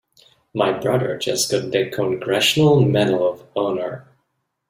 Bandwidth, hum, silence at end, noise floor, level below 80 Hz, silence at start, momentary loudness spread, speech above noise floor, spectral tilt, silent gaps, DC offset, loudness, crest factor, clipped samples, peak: 16 kHz; none; 0.7 s; -72 dBFS; -58 dBFS; 0.55 s; 10 LU; 54 dB; -4.5 dB/octave; none; under 0.1%; -19 LUFS; 16 dB; under 0.1%; -4 dBFS